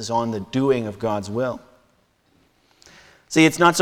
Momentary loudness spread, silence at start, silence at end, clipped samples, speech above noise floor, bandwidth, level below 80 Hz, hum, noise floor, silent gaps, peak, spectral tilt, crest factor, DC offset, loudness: 11 LU; 0 s; 0 s; under 0.1%; 42 dB; 17 kHz; -58 dBFS; none; -62 dBFS; none; -4 dBFS; -4.5 dB/octave; 18 dB; under 0.1%; -21 LUFS